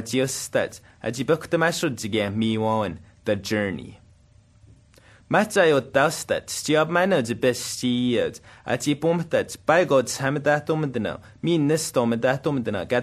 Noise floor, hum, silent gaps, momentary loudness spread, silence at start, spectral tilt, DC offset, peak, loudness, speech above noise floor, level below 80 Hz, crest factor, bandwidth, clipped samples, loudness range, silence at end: -55 dBFS; none; none; 10 LU; 0 s; -4.5 dB/octave; under 0.1%; -4 dBFS; -23 LUFS; 32 dB; -58 dBFS; 20 dB; 13 kHz; under 0.1%; 4 LU; 0 s